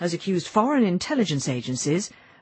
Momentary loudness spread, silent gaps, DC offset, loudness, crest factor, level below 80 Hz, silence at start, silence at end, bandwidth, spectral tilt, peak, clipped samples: 6 LU; none; under 0.1%; -24 LUFS; 18 dB; -62 dBFS; 0 s; 0.35 s; 8.8 kHz; -5 dB/octave; -6 dBFS; under 0.1%